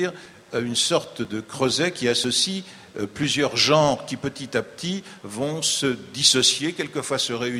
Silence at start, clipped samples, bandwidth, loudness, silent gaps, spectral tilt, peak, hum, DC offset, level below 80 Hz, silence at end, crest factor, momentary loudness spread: 0 s; under 0.1%; 15.5 kHz; -22 LUFS; none; -2.5 dB/octave; -4 dBFS; none; under 0.1%; -60 dBFS; 0 s; 20 dB; 13 LU